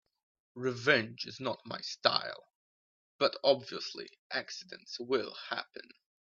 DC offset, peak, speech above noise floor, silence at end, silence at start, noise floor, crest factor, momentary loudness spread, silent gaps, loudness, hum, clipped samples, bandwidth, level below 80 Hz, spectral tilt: under 0.1%; -10 dBFS; over 56 dB; 0.45 s; 0.55 s; under -90 dBFS; 26 dB; 16 LU; 2.55-3.19 s, 4.19-4.30 s; -33 LUFS; none; under 0.1%; 7.4 kHz; -80 dBFS; -3.5 dB/octave